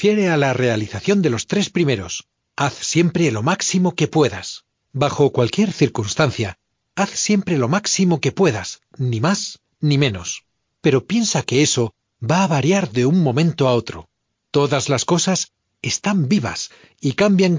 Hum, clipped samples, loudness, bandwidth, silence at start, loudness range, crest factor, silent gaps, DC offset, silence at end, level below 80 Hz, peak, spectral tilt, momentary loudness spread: none; under 0.1%; -19 LUFS; 7.6 kHz; 0 s; 2 LU; 18 dB; none; under 0.1%; 0 s; -50 dBFS; -2 dBFS; -5 dB/octave; 12 LU